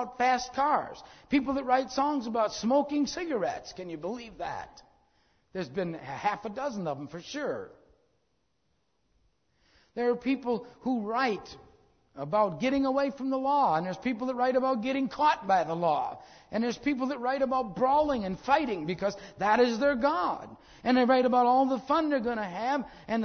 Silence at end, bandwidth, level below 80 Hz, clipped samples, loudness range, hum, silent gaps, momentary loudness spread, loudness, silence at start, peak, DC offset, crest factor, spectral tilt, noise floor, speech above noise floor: 0 s; 6.6 kHz; -60 dBFS; under 0.1%; 10 LU; none; none; 13 LU; -29 LUFS; 0 s; -10 dBFS; under 0.1%; 18 dB; -5.5 dB/octave; -76 dBFS; 47 dB